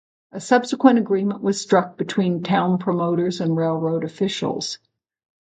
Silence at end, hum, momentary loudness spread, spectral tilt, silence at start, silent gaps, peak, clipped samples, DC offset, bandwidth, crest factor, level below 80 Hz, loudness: 0.75 s; none; 9 LU; -6 dB/octave; 0.35 s; none; -2 dBFS; under 0.1%; under 0.1%; 9.2 kHz; 20 dB; -68 dBFS; -21 LUFS